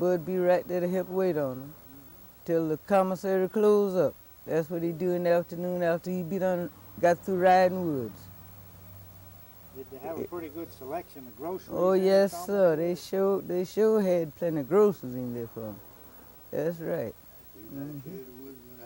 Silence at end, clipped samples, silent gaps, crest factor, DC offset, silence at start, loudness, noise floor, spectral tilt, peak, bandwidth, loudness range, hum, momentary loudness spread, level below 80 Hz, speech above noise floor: 0 s; under 0.1%; none; 16 dB; under 0.1%; 0 s; -28 LUFS; -50 dBFS; -7 dB/octave; -12 dBFS; 17 kHz; 11 LU; none; 23 LU; -64 dBFS; 23 dB